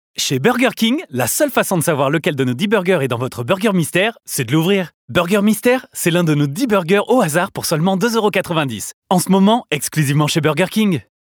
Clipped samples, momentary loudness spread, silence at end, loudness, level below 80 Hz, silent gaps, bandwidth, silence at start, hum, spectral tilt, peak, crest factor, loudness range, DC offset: under 0.1%; 5 LU; 0.3 s; -16 LUFS; -56 dBFS; 4.94-5.08 s, 8.94-9.02 s; over 20 kHz; 0.2 s; none; -5 dB/octave; 0 dBFS; 16 dB; 1 LU; under 0.1%